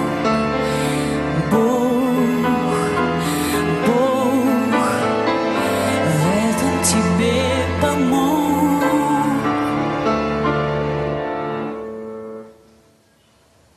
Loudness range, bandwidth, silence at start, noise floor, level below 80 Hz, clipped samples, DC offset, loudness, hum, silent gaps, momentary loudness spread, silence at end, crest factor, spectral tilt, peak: 5 LU; 13 kHz; 0 s; -55 dBFS; -42 dBFS; under 0.1%; under 0.1%; -18 LUFS; none; none; 7 LU; 1.25 s; 14 dB; -5.5 dB/octave; -4 dBFS